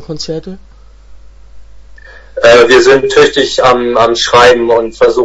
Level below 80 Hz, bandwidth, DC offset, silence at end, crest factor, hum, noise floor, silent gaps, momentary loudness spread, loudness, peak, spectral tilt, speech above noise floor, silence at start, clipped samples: -36 dBFS; 11 kHz; under 0.1%; 0 s; 10 dB; none; -35 dBFS; none; 15 LU; -7 LUFS; 0 dBFS; -3.5 dB/octave; 27 dB; 0 s; 0.9%